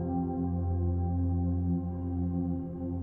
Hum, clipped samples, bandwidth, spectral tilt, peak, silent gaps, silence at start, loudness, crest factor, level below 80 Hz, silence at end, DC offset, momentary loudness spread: none; under 0.1%; 1.7 kHz; -14 dB/octave; -20 dBFS; none; 0 s; -32 LUFS; 10 dB; -42 dBFS; 0 s; under 0.1%; 4 LU